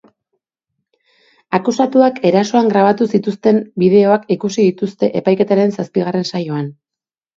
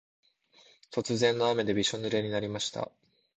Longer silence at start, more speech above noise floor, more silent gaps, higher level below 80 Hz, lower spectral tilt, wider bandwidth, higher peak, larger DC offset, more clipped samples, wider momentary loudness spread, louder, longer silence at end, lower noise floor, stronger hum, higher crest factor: first, 1.5 s vs 0.9 s; first, 73 dB vs 32 dB; neither; about the same, -62 dBFS vs -64 dBFS; first, -6.5 dB/octave vs -4 dB/octave; second, 7.6 kHz vs 9 kHz; first, 0 dBFS vs -12 dBFS; neither; neither; second, 8 LU vs 11 LU; first, -15 LUFS vs -30 LUFS; first, 0.65 s vs 0.5 s; first, -87 dBFS vs -62 dBFS; neither; second, 14 dB vs 20 dB